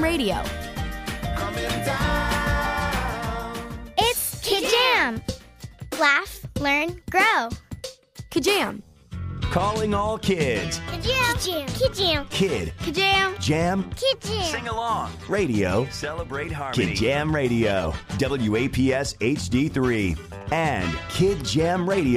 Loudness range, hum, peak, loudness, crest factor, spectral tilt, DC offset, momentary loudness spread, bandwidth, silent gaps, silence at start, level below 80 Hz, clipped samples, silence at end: 3 LU; none; -6 dBFS; -23 LUFS; 18 dB; -4.5 dB/octave; under 0.1%; 12 LU; 15.5 kHz; none; 0 s; -38 dBFS; under 0.1%; 0 s